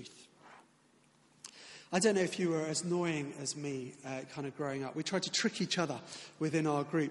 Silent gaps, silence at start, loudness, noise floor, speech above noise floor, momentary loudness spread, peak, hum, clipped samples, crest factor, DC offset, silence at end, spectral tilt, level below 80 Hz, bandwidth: none; 0 s; -35 LUFS; -68 dBFS; 33 dB; 17 LU; -14 dBFS; none; under 0.1%; 22 dB; under 0.1%; 0 s; -4 dB/octave; -78 dBFS; 11.5 kHz